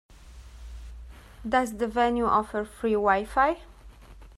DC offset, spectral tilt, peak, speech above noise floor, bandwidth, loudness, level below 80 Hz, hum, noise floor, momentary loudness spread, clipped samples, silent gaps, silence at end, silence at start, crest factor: under 0.1%; -5.5 dB/octave; -8 dBFS; 23 dB; 14 kHz; -26 LUFS; -46 dBFS; none; -48 dBFS; 22 LU; under 0.1%; none; 0.1 s; 0.25 s; 20 dB